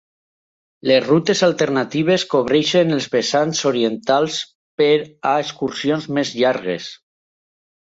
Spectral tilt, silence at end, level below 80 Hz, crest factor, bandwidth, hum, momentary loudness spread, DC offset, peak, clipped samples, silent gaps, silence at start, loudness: -4.5 dB/octave; 1 s; -62 dBFS; 16 dB; 8 kHz; none; 9 LU; under 0.1%; -2 dBFS; under 0.1%; 4.55-4.78 s; 0.85 s; -18 LUFS